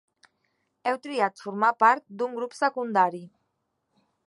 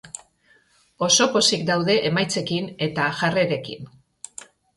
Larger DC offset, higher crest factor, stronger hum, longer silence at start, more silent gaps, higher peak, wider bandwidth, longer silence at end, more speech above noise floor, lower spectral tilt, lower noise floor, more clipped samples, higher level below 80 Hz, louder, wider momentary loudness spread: neither; about the same, 22 dB vs 20 dB; neither; first, 0.85 s vs 0.05 s; neither; about the same, -6 dBFS vs -4 dBFS; about the same, 11.5 kHz vs 11.5 kHz; about the same, 1 s vs 0.9 s; first, 52 dB vs 38 dB; first, -5 dB/octave vs -3 dB/octave; first, -77 dBFS vs -60 dBFS; neither; second, -86 dBFS vs -62 dBFS; second, -25 LUFS vs -21 LUFS; second, 11 LU vs 22 LU